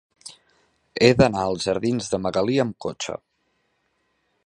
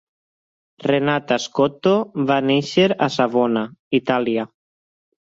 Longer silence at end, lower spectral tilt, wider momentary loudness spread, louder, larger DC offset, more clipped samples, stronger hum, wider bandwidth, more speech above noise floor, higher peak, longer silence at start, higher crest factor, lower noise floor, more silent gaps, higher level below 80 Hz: first, 1.3 s vs 0.9 s; about the same, -5.5 dB/octave vs -5.5 dB/octave; first, 21 LU vs 6 LU; second, -22 LUFS vs -19 LUFS; neither; neither; neither; first, 11.5 kHz vs 7.8 kHz; second, 49 dB vs over 71 dB; first, 0 dBFS vs -4 dBFS; second, 0.25 s vs 0.8 s; first, 24 dB vs 18 dB; second, -70 dBFS vs under -90 dBFS; second, none vs 3.79-3.91 s; first, -50 dBFS vs -62 dBFS